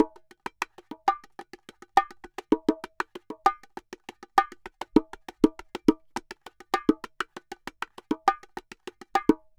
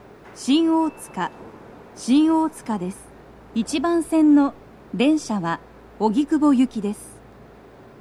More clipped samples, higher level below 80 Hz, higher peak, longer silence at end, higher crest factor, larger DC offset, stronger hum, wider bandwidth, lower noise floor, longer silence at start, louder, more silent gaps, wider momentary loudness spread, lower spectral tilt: neither; about the same, -56 dBFS vs -54 dBFS; first, -2 dBFS vs -6 dBFS; second, 0.2 s vs 0.9 s; first, 26 dB vs 16 dB; neither; neither; first, 16.5 kHz vs 13.5 kHz; first, -51 dBFS vs -46 dBFS; second, 0 s vs 0.25 s; second, -28 LUFS vs -21 LUFS; neither; first, 19 LU vs 16 LU; about the same, -5 dB/octave vs -5.5 dB/octave